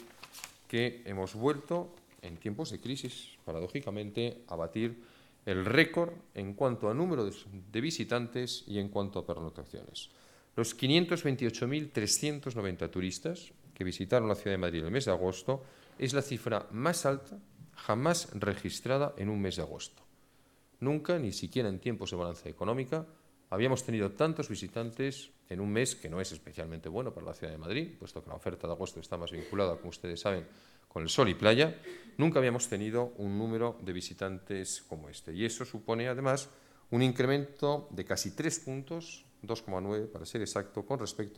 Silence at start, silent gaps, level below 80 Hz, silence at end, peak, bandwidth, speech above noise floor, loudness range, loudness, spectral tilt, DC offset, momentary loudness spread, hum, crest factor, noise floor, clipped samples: 0 s; none; -62 dBFS; 0 s; -10 dBFS; 17 kHz; 32 dB; 7 LU; -34 LUFS; -5 dB/octave; under 0.1%; 14 LU; none; 26 dB; -65 dBFS; under 0.1%